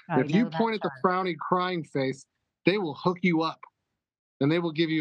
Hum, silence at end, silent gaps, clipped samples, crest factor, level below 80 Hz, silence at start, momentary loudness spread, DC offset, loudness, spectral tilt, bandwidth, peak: none; 0 s; 4.19-4.40 s; under 0.1%; 20 dB; -78 dBFS; 0.1 s; 5 LU; under 0.1%; -27 LUFS; -7 dB/octave; 9 kHz; -8 dBFS